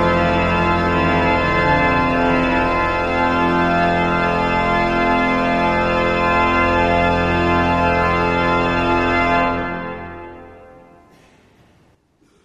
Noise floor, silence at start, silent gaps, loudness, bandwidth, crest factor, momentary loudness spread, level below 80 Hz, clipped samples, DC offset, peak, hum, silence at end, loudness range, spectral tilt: -57 dBFS; 0 s; none; -16 LUFS; 10 kHz; 14 dB; 3 LU; -32 dBFS; under 0.1%; under 0.1%; -4 dBFS; none; 1.8 s; 4 LU; -6.5 dB/octave